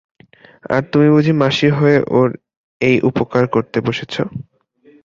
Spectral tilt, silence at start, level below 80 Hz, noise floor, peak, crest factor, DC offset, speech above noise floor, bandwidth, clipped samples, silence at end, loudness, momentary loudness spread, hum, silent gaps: -7.5 dB/octave; 0.7 s; -52 dBFS; -50 dBFS; -2 dBFS; 14 dB; under 0.1%; 36 dB; 7.6 kHz; under 0.1%; 0.6 s; -15 LUFS; 11 LU; none; 2.57-2.80 s